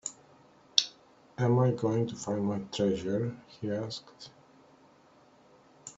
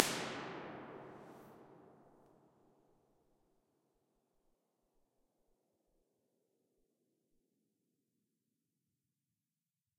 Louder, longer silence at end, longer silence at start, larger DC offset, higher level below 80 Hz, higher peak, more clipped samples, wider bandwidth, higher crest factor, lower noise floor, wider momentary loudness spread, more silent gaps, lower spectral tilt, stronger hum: first, -31 LUFS vs -44 LUFS; second, 0.05 s vs 7.7 s; about the same, 0.05 s vs 0 s; neither; first, -68 dBFS vs -84 dBFS; about the same, 0 dBFS vs -2 dBFS; neither; second, 8 kHz vs 15.5 kHz; second, 32 dB vs 48 dB; second, -60 dBFS vs under -90 dBFS; about the same, 23 LU vs 22 LU; neither; first, -5.5 dB/octave vs -2.5 dB/octave; neither